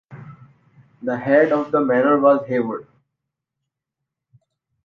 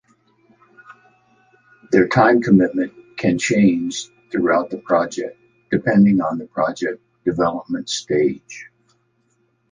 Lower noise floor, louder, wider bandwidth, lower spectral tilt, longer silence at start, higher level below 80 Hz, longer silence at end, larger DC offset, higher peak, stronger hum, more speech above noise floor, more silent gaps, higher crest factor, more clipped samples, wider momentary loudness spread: first, -83 dBFS vs -64 dBFS; about the same, -18 LUFS vs -19 LUFS; second, 6.2 kHz vs 9.6 kHz; first, -9 dB/octave vs -6 dB/octave; second, 0.1 s vs 0.9 s; second, -66 dBFS vs -54 dBFS; first, 2.05 s vs 1.1 s; neither; about the same, -4 dBFS vs -2 dBFS; neither; first, 65 dB vs 47 dB; neither; about the same, 18 dB vs 18 dB; neither; about the same, 12 LU vs 13 LU